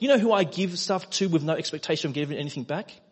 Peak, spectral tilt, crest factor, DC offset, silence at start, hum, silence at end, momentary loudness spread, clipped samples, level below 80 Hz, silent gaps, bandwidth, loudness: -8 dBFS; -5 dB/octave; 18 dB; under 0.1%; 0 s; none; 0.15 s; 11 LU; under 0.1%; -72 dBFS; none; 8.4 kHz; -26 LUFS